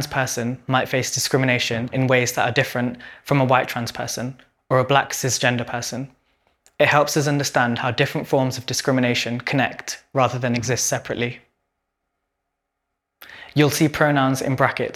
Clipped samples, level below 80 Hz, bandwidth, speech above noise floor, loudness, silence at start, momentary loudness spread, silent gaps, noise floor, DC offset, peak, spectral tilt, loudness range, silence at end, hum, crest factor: under 0.1%; -56 dBFS; 17 kHz; 58 dB; -20 LUFS; 0 s; 9 LU; none; -79 dBFS; under 0.1%; 0 dBFS; -4.5 dB/octave; 5 LU; 0 s; none; 22 dB